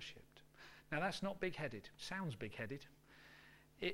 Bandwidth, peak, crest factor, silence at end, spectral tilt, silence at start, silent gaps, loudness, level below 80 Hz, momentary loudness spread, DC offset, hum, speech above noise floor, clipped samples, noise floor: 16.5 kHz; -26 dBFS; 22 dB; 0 s; -5 dB/octave; 0 s; none; -45 LUFS; -68 dBFS; 21 LU; under 0.1%; none; 20 dB; under 0.1%; -65 dBFS